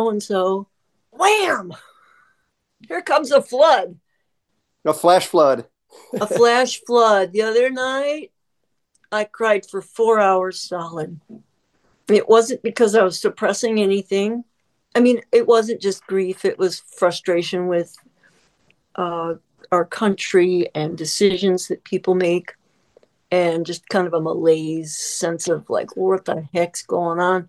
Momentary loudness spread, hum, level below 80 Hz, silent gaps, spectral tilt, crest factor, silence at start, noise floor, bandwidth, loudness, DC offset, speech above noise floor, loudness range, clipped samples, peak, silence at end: 11 LU; none; -70 dBFS; none; -4 dB/octave; 18 dB; 0 s; -76 dBFS; 12.5 kHz; -19 LUFS; under 0.1%; 58 dB; 4 LU; under 0.1%; -2 dBFS; 0.05 s